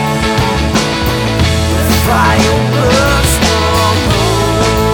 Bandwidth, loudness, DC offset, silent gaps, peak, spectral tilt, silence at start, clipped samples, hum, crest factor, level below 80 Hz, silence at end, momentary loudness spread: over 20 kHz; -11 LUFS; under 0.1%; none; 0 dBFS; -4.5 dB/octave; 0 s; under 0.1%; none; 10 dB; -20 dBFS; 0 s; 3 LU